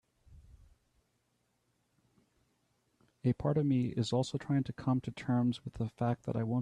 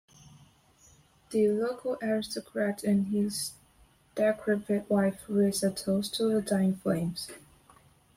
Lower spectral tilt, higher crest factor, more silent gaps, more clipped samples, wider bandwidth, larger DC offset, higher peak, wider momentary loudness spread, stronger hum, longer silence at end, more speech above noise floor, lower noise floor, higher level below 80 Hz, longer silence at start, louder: first, -7.5 dB/octave vs -5.5 dB/octave; about the same, 16 dB vs 16 dB; neither; neither; second, 10 kHz vs 16 kHz; neither; second, -20 dBFS vs -14 dBFS; second, 5 LU vs 8 LU; first, 60 Hz at -55 dBFS vs none; second, 0 s vs 0.8 s; first, 45 dB vs 34 dB; first, -78 dBFS vs -62 dBFS; about the same, -62 dBFS vs -64 dBFS; second, 0.3 s vs 1.3 s; second, -34 LUFS vs -29 LUFS